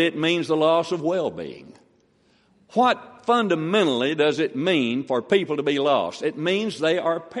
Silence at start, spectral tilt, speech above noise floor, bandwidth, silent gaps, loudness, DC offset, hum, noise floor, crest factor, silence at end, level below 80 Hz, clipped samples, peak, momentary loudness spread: 0 s; -5.5 dB/octave; 39 dB; 11.5 kHz; none; -22 LUFS; under 0.1%; none; -61 dBFS; 16 dB; 0 s; -70 dBFS; under 0.1%; -6 dBFS; 6 LU